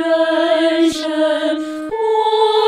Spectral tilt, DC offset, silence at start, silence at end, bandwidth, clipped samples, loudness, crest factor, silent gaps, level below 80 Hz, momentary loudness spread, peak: -3 dB/octave; under 0.1%; 0 s; 0 s; 15 kHz; under 0.1%; -16 LUFS; 14 dB; none; -58 dBFS; 6 LU; -2 dBFS